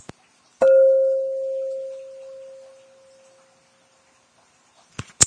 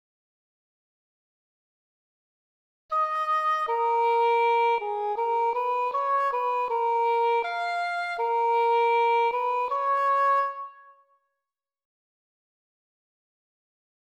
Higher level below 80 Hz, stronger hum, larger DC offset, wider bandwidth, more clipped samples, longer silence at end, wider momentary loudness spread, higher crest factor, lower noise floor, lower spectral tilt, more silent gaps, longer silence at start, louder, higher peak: first, -62 dBFS vs -78 dBFS; neither; neither; second, 11 kHz vs 13 kHz; neither; second, 0 s vs 3.3 s; first, 25 LU vs 6 LU; first, 24 dB vs 12 dB; second, -59 dBFS vs -88 dBFS; about the same, -2 dB/octave vs -1 dB/octave; neither; second, 0.6 s vs 2.9 s; first, -19 LUFS vs -25 LUFS; first, 0 dBFS vs -14 dBFS